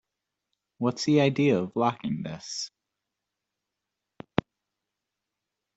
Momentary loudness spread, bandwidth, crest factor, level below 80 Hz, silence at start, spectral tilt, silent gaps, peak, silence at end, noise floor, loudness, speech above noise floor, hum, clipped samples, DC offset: 12 LU; 8.2 kHz; 26 dB; -64 dBFS; 0.8 s; -5.5 dB/octave; none; -4 dBFS; 3.1 s; -86 dBFS; -27 LUFS; 60 dB; none; under 0.1%; under 0.1%